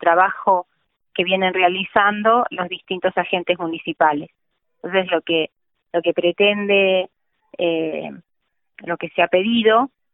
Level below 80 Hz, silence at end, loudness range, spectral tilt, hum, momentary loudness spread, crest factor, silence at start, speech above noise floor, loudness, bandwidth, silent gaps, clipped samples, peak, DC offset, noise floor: -64 dBFS; 0.25 s; 3 LU; -9.5 dB/octave; none; 12 LU; 18 dB; 0 s; 54 dB; -19 LUFS; 4 kHz; none; under 0.1%; -2 dBFS; under 0.1%; -72 dBFS